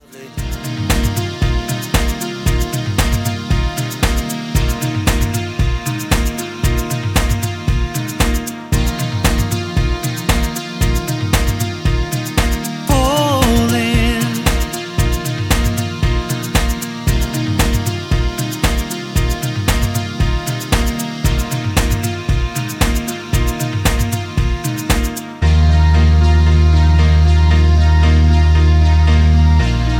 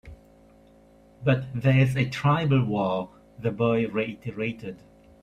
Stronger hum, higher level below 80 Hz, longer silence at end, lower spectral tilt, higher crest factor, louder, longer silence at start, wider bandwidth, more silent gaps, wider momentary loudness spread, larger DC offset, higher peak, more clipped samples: neither; first, -18 dBFS vs -54 dBFS; second, 0 s vs 0.45 s; second, -5 dB/octave vs -8 dB/octave; about the same, 14 dB vs 16 dB; first, -16 LUFS vs -25 LUFS; about the same, 0.1 s vs 0.05 s; first, 17 kHz vs 9.6 kHz; neither; second, 8 LU vs 11 LU; neither; first, 0 dBFS vs -10 dBFS; neither